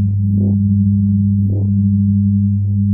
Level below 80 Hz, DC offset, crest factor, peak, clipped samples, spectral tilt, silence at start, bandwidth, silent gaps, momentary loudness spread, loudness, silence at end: -38 dBFS; under 0.1%; 8 dB; -6 dBFS; under 0.1%; -17 dB/octave; 0 s; 0.8 kHz; none; 2 LU; -14 LUFS; 0 s